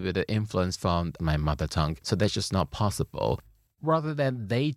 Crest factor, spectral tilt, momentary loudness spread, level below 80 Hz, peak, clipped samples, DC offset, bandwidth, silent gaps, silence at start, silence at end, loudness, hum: 18 dB; -6 dB/octave; 3 LU; -42 dBFS; -10 dBFS; under 0.1%; under 0.1%; 14.5 kHz; none; 0 s; 0 s; -28 LUFS; none